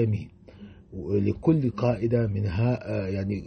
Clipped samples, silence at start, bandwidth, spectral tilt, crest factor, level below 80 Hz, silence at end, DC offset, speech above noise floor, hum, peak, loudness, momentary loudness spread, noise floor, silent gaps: under 0.1%; 0 s; 6.2 kHz; -10 dB/octave; 16 dB; -48 dBFS; 0 s; under 0.1%; 22 dB; none; -10 dBFS; -26 LUFS; 11 LU; -47 dBFS; none